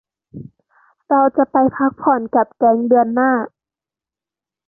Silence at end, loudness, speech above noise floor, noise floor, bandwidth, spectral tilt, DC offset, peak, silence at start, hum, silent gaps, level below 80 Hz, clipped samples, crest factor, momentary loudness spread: 1.2 s; -16 LUFS; 74 dB; -89 dBFS; 2.2 kHz; -12.5 dB/octave; under 0.1%; -2 dBFS; 0.35 s; none; none; -60 dBFS; under 0.1%; 16 dB; 5 LU